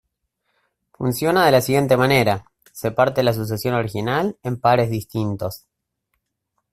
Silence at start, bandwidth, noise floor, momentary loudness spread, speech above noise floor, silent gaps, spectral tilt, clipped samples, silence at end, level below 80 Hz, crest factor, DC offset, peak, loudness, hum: 1 s; 16 kHz; -75 dBFS; 11 LU; 56 dB; none; -5.5 dB/octave; under 0.1%; 1.15 s; -52 dBFS; 18 dB; under 0.1%; -2 dBFS; -20 LUFS; none